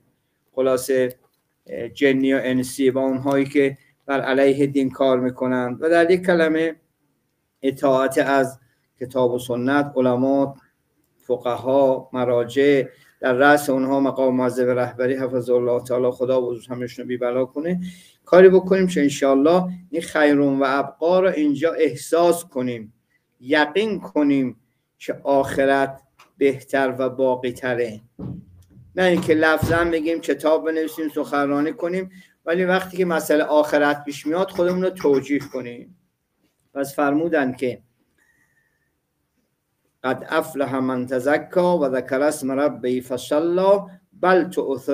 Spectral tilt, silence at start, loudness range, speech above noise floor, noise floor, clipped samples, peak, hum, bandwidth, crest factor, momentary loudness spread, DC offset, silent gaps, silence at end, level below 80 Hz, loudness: -6 dB/octave; 0.55 s; 5 LU; 52 dB; -72 dBFS; under 0.1%; 0 dBFS; none; 16 kHz; 20 dB; 11 LU; under 0.1%; none; 0 s; -56 dBFS; -20 LUFS